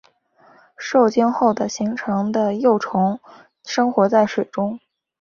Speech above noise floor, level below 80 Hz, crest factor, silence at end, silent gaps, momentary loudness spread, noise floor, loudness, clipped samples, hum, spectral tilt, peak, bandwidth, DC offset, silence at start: 35 dB; -64 dBFS; 18 dB; 0.45 s; none; 10 LU; -54 dBFS; -19 LUFS; under 0.1%; none; -6 dB/octave; -2 dBFS; 7.2 kHz; under 0.1%; 0.8 s